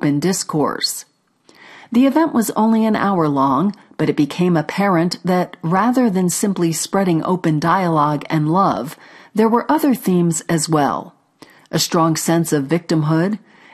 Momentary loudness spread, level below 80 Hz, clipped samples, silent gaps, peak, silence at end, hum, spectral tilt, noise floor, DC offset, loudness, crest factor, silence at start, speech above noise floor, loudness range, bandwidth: 5 LU; -58 dBFS; under 0.1%; none; -2 dBFS; 0.35 s; none; -5.5 dB/octave; -53 dBFS; under 0.1%; -17 LUFS; 14 dB; 0 s; 36 dB; 1 LU; 13.5 kHz